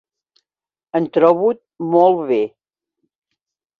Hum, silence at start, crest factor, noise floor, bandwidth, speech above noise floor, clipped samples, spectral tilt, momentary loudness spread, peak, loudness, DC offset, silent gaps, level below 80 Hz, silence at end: none; 0.95 s; 18 dB; under -90 dBFS; 5.2 kHz; over 75 dB; under 0.1%; -9 dB/octave; 11 LU; -2 dBFS; -17 LUFS; under 0.1%; none; -66 dBFS; 1.3 s